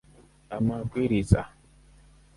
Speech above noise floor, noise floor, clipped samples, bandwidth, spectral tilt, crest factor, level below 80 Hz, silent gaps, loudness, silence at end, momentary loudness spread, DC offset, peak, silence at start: 30 dB; -55 dBFS; under 0.1%; 11.5 kHz; -8 dB/octave; 24 dB; -42 dBFS; none; -27 LUFS; 0.9 s; 14 LU; under 0.1%; -6 dBFS; 0.5 s